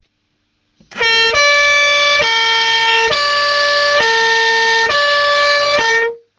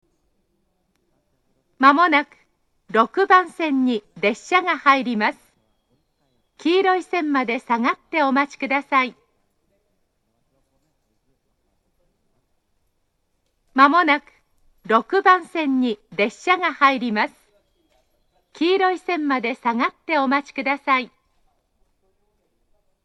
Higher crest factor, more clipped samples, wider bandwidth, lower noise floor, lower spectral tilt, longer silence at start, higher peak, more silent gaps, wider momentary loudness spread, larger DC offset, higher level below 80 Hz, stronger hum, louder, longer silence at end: second, 12 dB vs 22 dB; neither; about the same, 10 kHz vs 10.5 kHz; second, -65 dBFS vs -70 dBFS; second, 0.5 dB/octave vs -4.5 dB/octave; second, 0.9 s vs 1.8 s; about the same, 0 dBFS vs 0 dBFS; neither; second, 3 LU vs 8 LU; neither; first, -50 dBFS vs -70 dBFS; neither; first, -11 LUFS vs -19 LUFS; second, 0.2 s vs 2 s